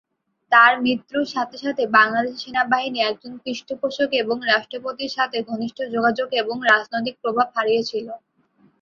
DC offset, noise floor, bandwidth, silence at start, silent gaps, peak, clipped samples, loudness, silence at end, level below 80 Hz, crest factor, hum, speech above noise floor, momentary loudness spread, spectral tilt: under 0.1%; -59 dBFS; 7.6 kHz; 0.5 s; none; -2 dBFS; under 0.1%; -20 LUFS; 0.65 s; -68 dBFS; 20 dB; none; 38 dB; 13 LU; -4 dB/octave